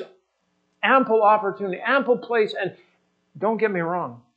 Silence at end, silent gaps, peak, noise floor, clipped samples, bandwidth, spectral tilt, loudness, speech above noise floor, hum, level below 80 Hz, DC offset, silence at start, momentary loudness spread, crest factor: 0.2 s; none; -4 dBFS; -71 dBFS; under 0.1%; 7.6 kHz; -7.5 dB/octave; -22 LUFS; 49 dB; none; -82 dBFS; under 0.1%; 0 s; 11 LU; 18 dB